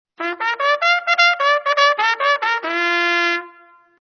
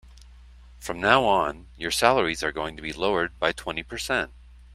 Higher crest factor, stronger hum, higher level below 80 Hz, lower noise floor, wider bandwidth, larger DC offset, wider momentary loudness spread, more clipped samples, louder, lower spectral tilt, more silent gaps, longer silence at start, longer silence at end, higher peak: second, 18 dB vs 24 dB; second, none vs 60 Hz at -45 dBFS; second, -78 dBFS vs -46 dBFS; about the same, -49 dBFS vs -48 dBFS; second, 6.6 kHz vs 15.5 kHz; neither; second, 7 LU vs 13 LU; neither; first, -16 LUFS vs -24 LUFS; second, 1 dB/octave vs -3.5 dB/octave; neither; first, 0.2 s vs 0.05 s; first, 0.5 s vs 0 s; about the same, -2 dBFS vs -2 dBFS